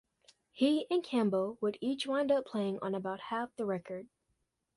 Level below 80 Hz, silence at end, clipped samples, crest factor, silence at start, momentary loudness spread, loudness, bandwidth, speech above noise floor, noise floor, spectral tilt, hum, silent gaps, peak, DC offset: -78 dBFS; 0.7 s; under 0.1%; 16 dB; 0.55 s; 7 LU; -34 LUFS; 11.5 kHz; 48 dB; -81 dBFS; -6 dB/octave; none; none; -18 dBFS; under 0.1%